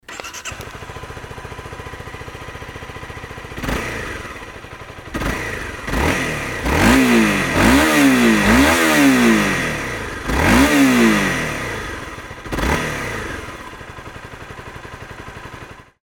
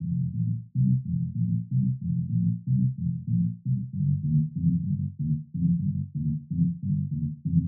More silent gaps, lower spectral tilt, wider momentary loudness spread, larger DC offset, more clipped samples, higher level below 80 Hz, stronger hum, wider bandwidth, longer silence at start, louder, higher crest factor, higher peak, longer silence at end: neither; second, -4.5 dB/octave vs -29 dB/octave; first, 22 LU vs 5 LU; neither; neither; first, -32 dBFS vs -50 dBFS; neither; first, 20 kHz vs 0.4 kHz; about the same, 0.1 s vs 0 s; first, -16 LUFS vs -28 LUFS; about the same, 18 dB vs 14 dB; first, 0 dBFS vs -12 dBFS; first, 0.2 s vs 0 s